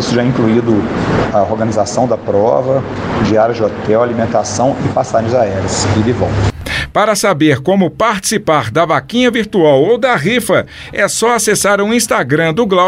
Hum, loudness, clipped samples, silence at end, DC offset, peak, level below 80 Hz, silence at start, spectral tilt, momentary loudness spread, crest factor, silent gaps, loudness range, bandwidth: none; -13 LUFS; under 0.1%; 0 s; under 0.1%; 0 dBFS; -36 dBFS; 0 s; -5 dB/octave; 4 LU; 12 dB; none; 2 LU; 16 kHz